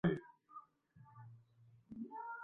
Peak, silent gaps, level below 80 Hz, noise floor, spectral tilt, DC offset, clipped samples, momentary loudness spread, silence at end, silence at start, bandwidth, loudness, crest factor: -22 dBFS; none; -74 dBFS; -68 dBFS; -7 dB/octave; under 0.1%; under 0.1%; 22 LU; 0 s; 0.05 s; 3.8 kHz; -49 LUFS; 24 dB